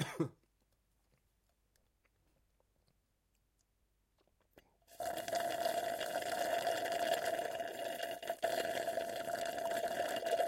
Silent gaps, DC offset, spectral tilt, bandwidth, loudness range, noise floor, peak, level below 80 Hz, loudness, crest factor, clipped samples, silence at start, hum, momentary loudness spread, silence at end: none; under 0.1%; -3.5 dB/octave; 16.5 kHz; 10 LU; -79 dBFS; -22 dBFS; -76 dBFS; -39 LUFS; 20 dB; under 0.1%; 0 s; none; 6 LU; 0 s